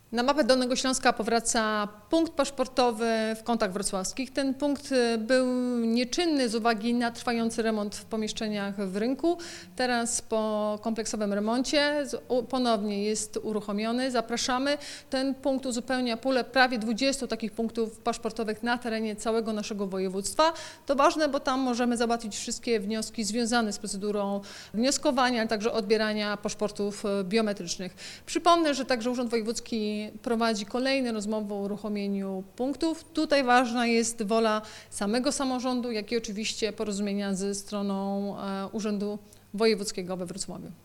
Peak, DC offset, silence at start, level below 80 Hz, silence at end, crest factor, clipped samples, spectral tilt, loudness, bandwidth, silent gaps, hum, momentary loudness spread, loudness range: -8 dBFS; under 0.1%; 0.1 s; -56 dBFS; 0.1 s; 20 dB; under 0.1%; -3.5 dB/octave; -28 LUFS; 16.5 kHz; none; none; 8 LU; 3 LU